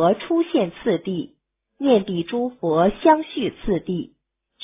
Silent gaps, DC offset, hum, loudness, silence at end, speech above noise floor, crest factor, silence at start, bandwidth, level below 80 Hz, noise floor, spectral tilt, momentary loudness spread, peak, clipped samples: none; under 0.1%; none; -21 LUFS; 0.6 s; 26 dB; 20 dB; 0 s; 3.9 kHz; -50 dBFS; -46 dBFS; -11 dB/octave; 11 LU; -2 dBFS; under 0.1%